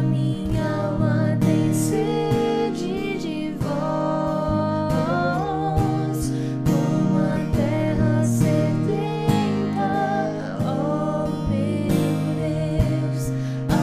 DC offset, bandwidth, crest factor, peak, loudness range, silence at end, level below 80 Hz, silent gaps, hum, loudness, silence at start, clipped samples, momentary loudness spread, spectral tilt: under 0.1%; 15.5 kHz; 16 dB; -4 dBFS; 2 LU; 0 s; -38 dBFS; none; none; -22 LUFS; 0 s; under 0.1%; 5 LU; -7 dB/octave